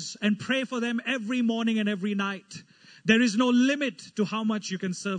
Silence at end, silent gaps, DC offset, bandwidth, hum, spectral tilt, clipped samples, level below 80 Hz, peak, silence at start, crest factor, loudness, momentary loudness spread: 0 s; none; under 0.1%; 9.4 kHz; none; -4.5 dB/octave; under 0.1%; -74 dBFS; -8 dBFS; 0 s; 18 dB; -26 LUFS; 10 LU